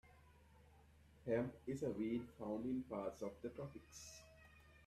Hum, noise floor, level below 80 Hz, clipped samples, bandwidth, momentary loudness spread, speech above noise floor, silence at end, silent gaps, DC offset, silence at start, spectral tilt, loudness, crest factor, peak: none; -67 dBFS; -70 dBFS; under 0.1%; 14 kHz; 16 LU; 22 dB; 0 s; none; under 0.1%; 0.05 s; -6.5 dB/octave; -46 LUFS; 20 dB; -28 dBFS